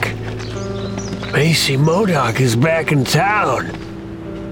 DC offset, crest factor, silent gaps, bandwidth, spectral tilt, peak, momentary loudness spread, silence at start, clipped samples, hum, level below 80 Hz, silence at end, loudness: 0.1%; 16 dB; none; 17.5 kHz; -5 dB/octave; 0 dBFS; 15 LU; 0 s; under 0.1%; none; -40 dBFS; 0 s; -16 LUFS